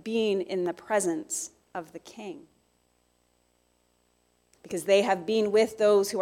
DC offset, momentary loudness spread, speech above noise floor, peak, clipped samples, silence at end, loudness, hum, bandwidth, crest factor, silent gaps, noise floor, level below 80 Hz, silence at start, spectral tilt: under 0.1%; 19 LU; 43 dB; -10 dBFS; under 0.1%; 0 s; -26 LUFS; 60 Hz at -70 dBFS; 16 kHz; 20 dB; none; -69 dBFS; -72 dBFS; 0.05 s; -3.5 dB/octave